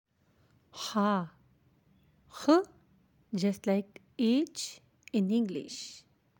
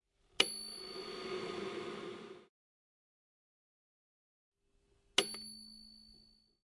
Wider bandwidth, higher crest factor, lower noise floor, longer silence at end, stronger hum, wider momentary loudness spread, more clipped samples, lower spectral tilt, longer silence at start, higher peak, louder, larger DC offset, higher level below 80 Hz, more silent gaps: first, 17 kHz vs 11.5 kHz; second, 20 dB vs 34 dB; second, -68 dBFS vs -75 dBFS; about the same, 0.4 s vs 0.35 s; neither; about the same, 19 LU vs 21 LU; neither; first, -5.5 dB/octave vs -1.5 dB/octave; first, 0.75 s vs 0.4 s; about the same, -12 dBFS vs -10 dBFS; first, -31 LUFS vs -38 LUFS; neither; about the same, -76 dBFS vs -76 dBFS; second, none vs 2.49-4.52 s